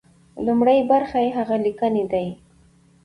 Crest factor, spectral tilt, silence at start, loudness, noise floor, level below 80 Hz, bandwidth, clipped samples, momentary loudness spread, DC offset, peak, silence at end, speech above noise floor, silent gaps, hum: 16 dB; -8 dB/octave; 0.35 s; -20 LUFS; -55 dBFS; -56 dBFS; 10.5 kHz; under 0.1%; 9 LU; under 0.1%; -6 dBFS; 0.7 s; 35 dB; none; none